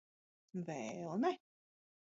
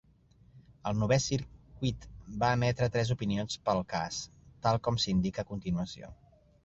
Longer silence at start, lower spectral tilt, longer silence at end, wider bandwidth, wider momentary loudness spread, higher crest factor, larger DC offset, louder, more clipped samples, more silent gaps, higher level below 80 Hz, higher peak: about the same, 0.55 s vs 0.55 s; about the same, -6 dB/octave vs -5.5 dB/octave; first, 0.75 s vs 0.5 s; about the same, 7.6 kHz vs 8.2 kHz; second, 11 LU vs 14 LU; about the same, 20 dB vs 20 dB; neither; second, -42 LUFS vs -32 LUFS; neither; neither; second, -88 dBFS vs -52 dBFS; second, -24 dBFS vs -14 dBFS